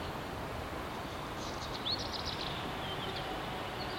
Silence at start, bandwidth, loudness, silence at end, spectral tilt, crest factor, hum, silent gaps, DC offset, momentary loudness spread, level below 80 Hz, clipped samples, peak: 0 s; 16.5 kHz; -38 LUFS; 0 s; -4 dB/octave; 16 dB; none; none; under 0.1%; 5 LU; -52 dBFS; under 0.1%; -22 dBFS